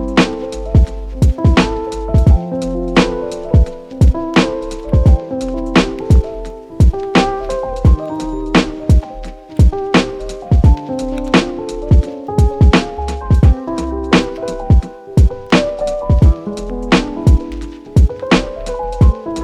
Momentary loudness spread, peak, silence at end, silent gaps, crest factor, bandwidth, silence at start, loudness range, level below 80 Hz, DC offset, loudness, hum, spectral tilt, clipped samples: 11 LU; 0 dBFS; 0 s; none; 12 dB; 10.5 kHz; 0 s; 1 LU; -16 dBFS; under 0.1%; -15 LUFS; none; -7 dB/octave; under 0.1%